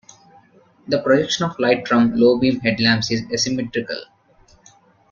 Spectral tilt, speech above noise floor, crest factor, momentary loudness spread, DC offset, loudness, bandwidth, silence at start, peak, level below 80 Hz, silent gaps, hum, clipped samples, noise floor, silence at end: -4.5 dB/octave; 35 dB; 18 dB; 9 LU; under 0.1%; -18 LUFS; 7.4 kHz; 0.85 s; -2 dBFS; -54 dBFS; none; none; under 0.1%; -54 dBFS; 1.05 s